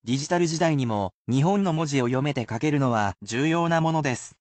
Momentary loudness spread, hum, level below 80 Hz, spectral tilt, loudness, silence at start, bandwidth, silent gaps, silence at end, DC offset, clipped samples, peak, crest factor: 5 LU; none; -58 dBFS; -6 dB/octave; -24 LUFS; 0.05 s; 9 kHz; 1.14-1.25 s; 0.1 s; under 0.1%; under 0.1%; -10 dBFS; 14 dB